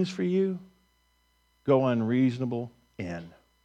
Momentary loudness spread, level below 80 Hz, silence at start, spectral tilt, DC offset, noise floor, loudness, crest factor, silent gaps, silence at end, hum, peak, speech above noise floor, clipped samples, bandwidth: 16 LU; -66 dBFS; 0 s; -8 dB/octave; under 0.1%; -69 dBFS; -28 LUFS; 18 dB; none; 0.35 s; none; -10 dBFS; 42 dB; under 0.1%; 8.6 kHz